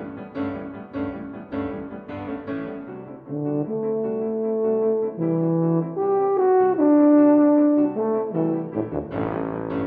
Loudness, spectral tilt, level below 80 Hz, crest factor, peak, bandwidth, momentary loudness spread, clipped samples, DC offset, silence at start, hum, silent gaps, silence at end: -22 LUFS; -12.5 dB/octave; -56 dBFS; 14 dB; -8 dBFS; 3.6 kHz; 17 LU; under 0.1%; under 0.1%; 0 s; none; none; 0 s